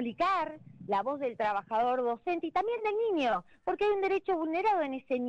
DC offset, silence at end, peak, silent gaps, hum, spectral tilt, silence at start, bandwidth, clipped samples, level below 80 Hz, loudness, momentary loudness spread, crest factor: under 0.1%; 0 s; -20 dBFS; none; none; -6 dB/octave; 0 s; 8.4 kHz; under 0.1%; -66 dBFS; -31 LUFS; 5 LU; 10 dB